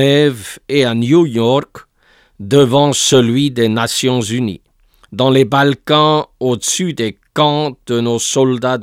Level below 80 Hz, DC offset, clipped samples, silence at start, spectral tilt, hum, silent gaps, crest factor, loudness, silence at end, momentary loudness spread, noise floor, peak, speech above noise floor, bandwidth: -52 dBFS; under 0.1%; under 0.1%; 0 s; -4.5 dB/octave; none; none; 14 dB; -13 LUFS; 0 s; 8 LU; -52 dBFS; 0 dBFS; 39 dB; 16.5 kHz